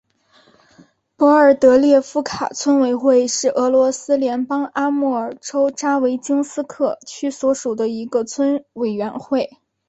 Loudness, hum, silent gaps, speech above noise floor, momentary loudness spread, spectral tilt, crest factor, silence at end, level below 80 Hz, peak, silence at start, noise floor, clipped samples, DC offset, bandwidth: -18 LUFS; none; none; 38 dB; 12 LU; -4 dB/octave; 16 dB; 0.45 s; -60 dBFS; -2 dBFS; 1.2 s; -55 dBFS; under 0.1%; under 0.1%; 8.2 kHz